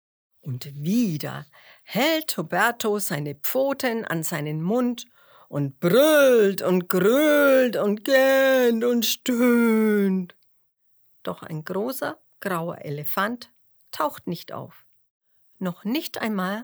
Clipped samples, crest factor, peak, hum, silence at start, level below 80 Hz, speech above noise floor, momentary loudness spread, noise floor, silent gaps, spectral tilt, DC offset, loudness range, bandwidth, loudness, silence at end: under 0.1%; 24 dB; 0 dBFS; none; 0.45 s; -76 dBFS; 42 dB; 16 LU; -64 dBFS; 15.10-15.21 s; -5 dB/octave; under 0.1%; 11 LU; over 20 kHz; -22 LUFS; 0 s